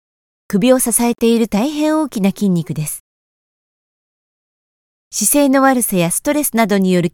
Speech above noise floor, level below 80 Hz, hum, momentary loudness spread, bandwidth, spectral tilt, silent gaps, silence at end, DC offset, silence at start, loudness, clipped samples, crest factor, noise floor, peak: over 76 dB; -48 dBFS; none; 10 LU; 19 kHz; -4.5 dB/octave; 3.00-5.11 s; 0.05 s; under 0.1%; 0.5 s; -15 LUFS; under 0.1%; 16 dB; under -90 dBFS; 0 dBFS